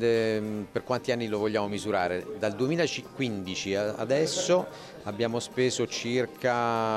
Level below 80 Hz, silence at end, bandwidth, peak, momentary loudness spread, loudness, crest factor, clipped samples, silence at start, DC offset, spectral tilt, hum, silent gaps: -64 dBFS; 0 s; 14 kHz; -12 dBFS; 6 LU; -29 LUFS; 16 dB; under 0.1%; 0 s; under 0.1%; -4.5 dB/octave; none; none